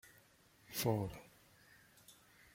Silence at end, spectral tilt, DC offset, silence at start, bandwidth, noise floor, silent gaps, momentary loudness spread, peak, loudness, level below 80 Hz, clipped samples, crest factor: 0.4 s; -5 dB/octave; under 0.1%; 0.05 s; 16.5 kHz; -68 dBFS; none; 26 LU; -22 dBFS; -40 LUFS; -68 dBFS; under 0.1%; 24 dB